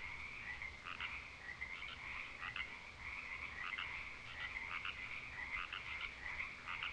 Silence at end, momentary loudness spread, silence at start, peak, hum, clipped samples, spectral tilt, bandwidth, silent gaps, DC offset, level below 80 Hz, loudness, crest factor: 0 s; 4 LU; 0 s; -30 dBFS; none; under 0.1%; -2.5 dB/octave; 10.5 kHz; none; under 0.1%; -64 dBFS; -46 LUFS; 18 dB